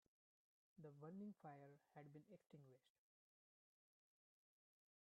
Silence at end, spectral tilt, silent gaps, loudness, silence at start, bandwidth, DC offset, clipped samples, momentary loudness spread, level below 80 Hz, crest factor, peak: 2.15 s; -8 dB/octave; none; -63 LUFS; 0.75 s; 4 kHz; under 0.1%; under 0.1%; 10 LU; under -90 dBFS; 18 dB; -48 dBFS